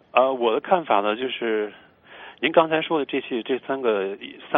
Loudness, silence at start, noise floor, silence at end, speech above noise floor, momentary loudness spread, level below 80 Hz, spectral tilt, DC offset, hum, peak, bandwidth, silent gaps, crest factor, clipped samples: -23 LUFS; 0.15 s; -45 dBFS; 0 s; 23 dB; 11 LU; -70 dBFS; -9 dB/octave; under 0.1%; none; -2 dBFS; 3.9 kHz; none; 20 dB; under 0.1%